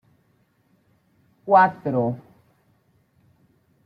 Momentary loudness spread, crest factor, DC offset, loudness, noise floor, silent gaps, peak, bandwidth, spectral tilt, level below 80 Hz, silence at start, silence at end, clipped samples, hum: 21 LU; 22 dB; under 0.1%; -20 LUFS; -64 dBFS; none; -4 dBFS; 5.6 kHz; -9 dB/octave; -70 dBFS; 1.45 s; 1.65 s; under 0.1%; none